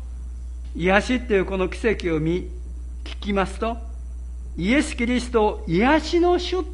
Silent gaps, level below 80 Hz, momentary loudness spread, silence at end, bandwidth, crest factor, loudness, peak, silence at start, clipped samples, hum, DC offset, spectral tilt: none; -32 dBFS; 17 LU; 0 s; 11.5 kHz; 20 dB; -22 LUFS; -2 dBFS; 0 s; under 0.1%; none; under 0.1%; -6 dB/octave